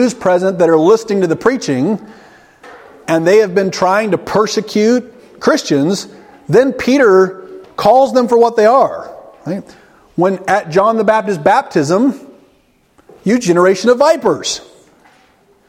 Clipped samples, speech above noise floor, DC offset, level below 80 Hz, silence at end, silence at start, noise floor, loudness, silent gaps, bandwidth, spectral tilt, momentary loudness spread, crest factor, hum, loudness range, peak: under 0.1%; 42 dB; under 0.1%; -54 dBFS; 1.1 s; 0 s; -53 dBFS; -12 LUFS; none; 16 kHz; -5 dB/octave; 14 LU; 14 dB; none; 3 LU; 0 dBFS